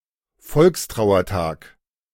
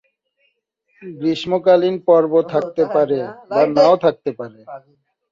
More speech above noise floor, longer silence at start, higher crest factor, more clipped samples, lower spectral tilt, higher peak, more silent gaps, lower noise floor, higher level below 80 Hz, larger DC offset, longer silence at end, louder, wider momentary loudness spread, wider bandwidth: second, 31 dB vs 50 dB; second, 0.45 s vs 1 s; about the same, 18 dB vs 16 dB; neither; about the same, -6 dB/octave vs -7 dB/octave; about the same, -4 dBFS vs -2 dBFS; neither; second, -49 dBFS vs -67 dBFS; first, -42 dBFS vs -62 dBFS; neither; about the same, 0.6 s vs 0.55 s; about the same, -19 LUFS vs -17 LUFS; second, 11 LU vs 19 LU; first, 16.5 kHz vs 7.4 kHz